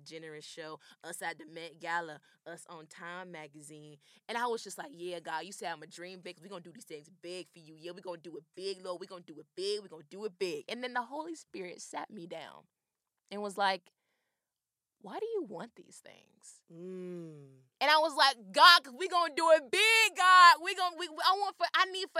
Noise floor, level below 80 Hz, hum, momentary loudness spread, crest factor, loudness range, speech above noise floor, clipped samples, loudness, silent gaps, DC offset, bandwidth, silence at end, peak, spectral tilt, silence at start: under -90 dBFS; under -90 dBFS; none; 25 LU; 26 dB; 21 LU; over 58 dB; under 0.1%; -28 LUFS; none; under 0.1%; 16 kHz; 0 s; -6 dBFS; -1.5 dB/octave; 0.05 s